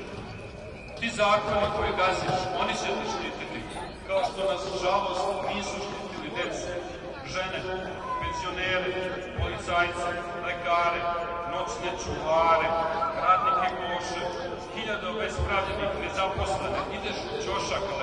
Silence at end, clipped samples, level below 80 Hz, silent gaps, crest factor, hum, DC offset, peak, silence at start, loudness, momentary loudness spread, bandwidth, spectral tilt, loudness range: 0 s; under 0.1%; -46 dBFS; none; 20 dB; none; under 0.1%; -10 dBFS; 0 s; -28 LUFS; 11 LU; 11 kHz; -4 dB/octave; 5 LU